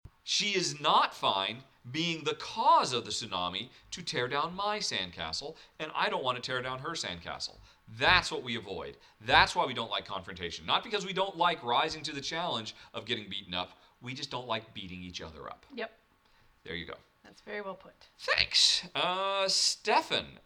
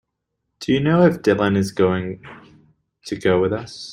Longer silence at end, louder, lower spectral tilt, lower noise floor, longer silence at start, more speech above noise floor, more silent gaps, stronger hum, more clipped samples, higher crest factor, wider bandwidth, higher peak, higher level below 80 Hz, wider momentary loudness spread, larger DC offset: about the same, 0.1 s vs 0 s; second, -30 LUFS vs -19 LUFS; second, -2 dB/octave vs -6.5 dB/octave; second, -65 dBFS vs -77 dBFS; second, 0.05 s vs 0.6 s; second, 33 dB vs 58 dB; neither; neither; neither; first, 26 dB vs 18 dB; about the same, 15.5 kHz vs 16 kHz; second, -6 dBFS vs -2 dBFS; second, -60 dBFS vs -52 dBFS; about the same, 17 LU vs 16 LU; neither